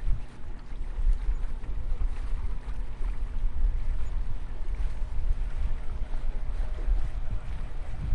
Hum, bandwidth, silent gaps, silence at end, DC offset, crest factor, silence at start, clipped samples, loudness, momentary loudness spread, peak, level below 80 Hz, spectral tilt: none; 4.2 kHz; none; 0 s; under 0.1%; 14 dB; 0 s; under 0.1%; -36 LUFS; 7 LU; -12 dBFS; -28 dBFS; -7 dB/octave